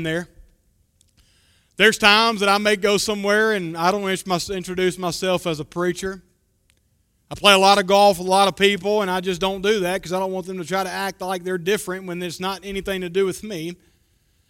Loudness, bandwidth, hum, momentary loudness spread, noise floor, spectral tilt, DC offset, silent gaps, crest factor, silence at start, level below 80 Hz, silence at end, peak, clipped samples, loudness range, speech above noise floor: -20 LUFS; 16.5 kHz; none; 15 LU; -65 dBFS; -3.5 dB/octave; under 0.1%; none; 22 dB; 0 s; -52 dBFS; 0.75 s; 0 dBFS; under 0.1%; 8 LU; 45 dB